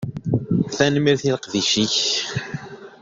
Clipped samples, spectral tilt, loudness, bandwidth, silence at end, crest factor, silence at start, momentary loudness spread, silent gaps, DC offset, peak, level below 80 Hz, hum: under 0.1%; -4 dB/octave; -20 LUFS; 7.8 kHz; 0.05 s; 20 dB; 0 s; 13 LU; none; under 0.1%; -2 dBFS; -54 dBFS; none